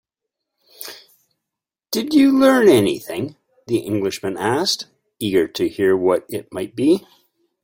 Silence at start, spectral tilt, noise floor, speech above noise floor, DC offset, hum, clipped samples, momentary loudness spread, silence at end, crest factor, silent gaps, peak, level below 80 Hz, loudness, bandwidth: 0.8 s; -5 dB/octave; -85 dBFS; 67 dB; under 0.1%; none; under 0.1%; 17 LU; 0.65 s; 18 dB; none; -2 dBFS; -60 dBFS; -18 LUFS; 16.5 kHz